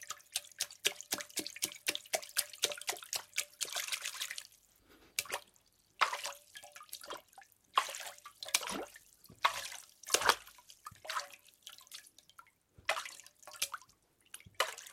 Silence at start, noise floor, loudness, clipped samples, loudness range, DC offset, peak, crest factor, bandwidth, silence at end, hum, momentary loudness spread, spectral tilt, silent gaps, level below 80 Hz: 0 s; -70 dBFS; -37 LUFS; under 0.1%; 7 LU; under 0.1%; -8 dBFS; 32 dB; 16.5 kHz; 0 s; none; 19 LU; 1 dB/octave; none; -76 dBFS